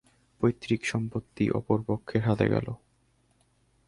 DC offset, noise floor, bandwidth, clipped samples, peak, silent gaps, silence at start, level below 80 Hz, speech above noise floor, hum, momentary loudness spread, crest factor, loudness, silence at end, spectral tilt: under 0.1%; -68 dBFS; 11.5 kHz; under 0.1%; -10 dBFS; none; 0.4 s; -54 dBFS; 40 dB; none; 8 LU; 20 dB; -29 LUFS; 1.1 s; -7 dB/octave